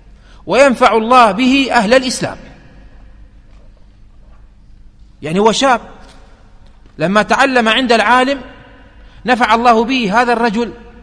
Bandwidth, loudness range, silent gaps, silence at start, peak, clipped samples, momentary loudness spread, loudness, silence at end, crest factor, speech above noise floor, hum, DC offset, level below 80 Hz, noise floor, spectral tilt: 11 kHz; 7 LU; none; 0.45 s; 0 dBFS; 0.1%; 12 LU; -12 LUFS; 0.15 s; 14 dB; 29 dB; none; under 0.1%; -40 dBFS; -40 dBFS; -4 dB/octave